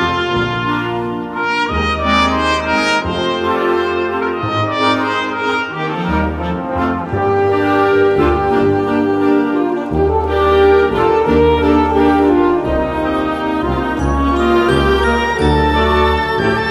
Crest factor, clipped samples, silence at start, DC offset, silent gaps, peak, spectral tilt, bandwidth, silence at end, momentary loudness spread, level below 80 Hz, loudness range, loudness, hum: 14 dB; under 0.1%; 0 s; under 0.1%; none; 0 dBFS; -6.5 dB/octave; 13 kHz; 0 s; 6 LU; -28 dBFS; 4 LU; -14 LUFS; none